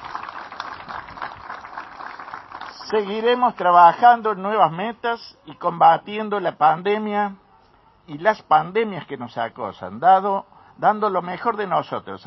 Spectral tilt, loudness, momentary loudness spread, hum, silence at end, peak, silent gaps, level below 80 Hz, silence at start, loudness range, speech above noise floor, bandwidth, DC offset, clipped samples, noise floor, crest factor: -6.5 dB/octave; -19 LUFS; 19 LU; none; 0.1 s; -2 dBFS; none; -62 dBFS; 0 s; 6 LU; 35 dB; 6 kHz; under 0.1%; under 0.1%; -55 dBFS; 20 dB